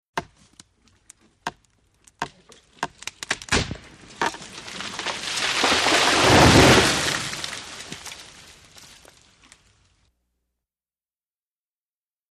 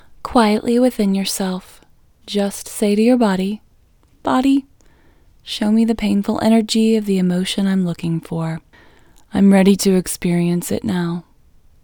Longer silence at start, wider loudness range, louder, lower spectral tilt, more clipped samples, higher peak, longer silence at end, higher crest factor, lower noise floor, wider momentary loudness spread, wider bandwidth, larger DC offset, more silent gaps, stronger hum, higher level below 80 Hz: about the same, 0.15 s vs 0.25 s; first, 19 LU vs 2 LU; about the same, -19 LUFS vs -17 LUFS; second, -3.5 dB/octave vs -6 dB/octave; neither; about the same, -2 dBFS vs 0 dBFS; first, 4.1 s vs 0.6 s; first, 24 dB vs 18 dB; first, under -90 dBFS vs -53 dBFS; first, 22 LU vs 11 LU; second, 15 kHz vs over 20 kHz; neither; neither; neither; first, -42 dBFS vs -48 dBFS